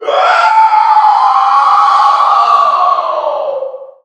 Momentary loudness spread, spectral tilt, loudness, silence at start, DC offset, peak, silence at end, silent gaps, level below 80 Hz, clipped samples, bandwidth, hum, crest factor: 9 LU; 0 dB/octave; -8 LUFS; 0 s; under 0.1%; 0 dBFS; 0.2 s; none; -74 dBFS; 0.1%; 9 kHz; none; 10 dB